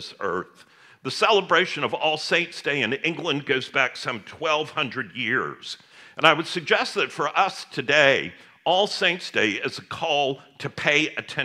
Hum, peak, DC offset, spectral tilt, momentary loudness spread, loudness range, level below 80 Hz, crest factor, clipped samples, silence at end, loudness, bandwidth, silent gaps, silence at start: none; 0 dBFS; under 0.1%; -3.5 dB/octave; 13 LU; 3 LU; -72 dBFS; 24 dB; under 0.1%; 0 s; -23 LUFS; 14 kHz; none; 0 s